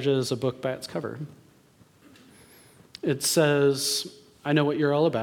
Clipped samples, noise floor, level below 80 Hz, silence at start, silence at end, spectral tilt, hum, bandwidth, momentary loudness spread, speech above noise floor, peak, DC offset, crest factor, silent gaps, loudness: under 0.1%; -58 dBFS; -70 dBFS; 0 s; 0 s; -4.5 dB/octave; none; 19 kHz; 15 LU; 33 dB; -8 dBFS; under 0.1%; 18 dB; none; -25 LUFS